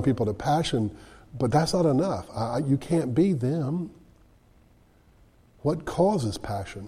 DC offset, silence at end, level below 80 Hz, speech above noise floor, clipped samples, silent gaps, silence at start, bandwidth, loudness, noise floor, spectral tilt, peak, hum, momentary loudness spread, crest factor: under 0.1%; 0 s; -50 dBFS; 33 dB; under 0.1%; none; 0 s; 14 kHz; -26 LUFS; -58 dBFS; -7 dB/octave; -8 dBFS; none; 10 LU; 18 dB